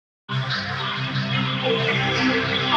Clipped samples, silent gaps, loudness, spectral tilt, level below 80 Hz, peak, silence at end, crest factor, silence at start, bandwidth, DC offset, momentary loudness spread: under 0.1%; none; -22 LUFS; -5.5 dB/octave; -54 dBFS; -8 dBFS; 0 s; 16 dB; 0.3 s; 7.8 kHz; under 0.1%; 5 LU